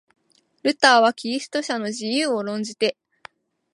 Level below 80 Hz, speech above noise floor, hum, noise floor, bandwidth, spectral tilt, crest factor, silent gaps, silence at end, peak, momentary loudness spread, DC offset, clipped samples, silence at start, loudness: -76 dBFS; 28 dB; none; -49 dBFS; 11.5 kHz; -2.5 dB/octave; 22 dB; none; 0.8 s; -2 dBFS; 11 LU; under 0.1%; under 0.1%; 0.65 s; -21 LUFS